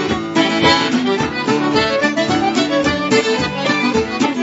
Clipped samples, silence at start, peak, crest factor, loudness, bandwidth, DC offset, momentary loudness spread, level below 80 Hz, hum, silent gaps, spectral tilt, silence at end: under 0.1%; 0 s; 0 dBFS; 16 dB; -15 LUFS; 8 kHz; under 0.1%; 5 LU; -44 dBFS; none; none; -4.5 dB/octave; 0 s